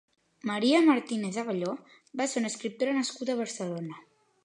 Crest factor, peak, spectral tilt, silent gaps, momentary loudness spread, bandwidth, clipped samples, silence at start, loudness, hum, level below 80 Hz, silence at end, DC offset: 20 dB; -10 dBFS; -4 dB/octave; none; 16 LU; 11 kHz; under 0.1%; 0.45 s; -29 LUFS; none; -84 dBFS; 0.45 s; under 0.1%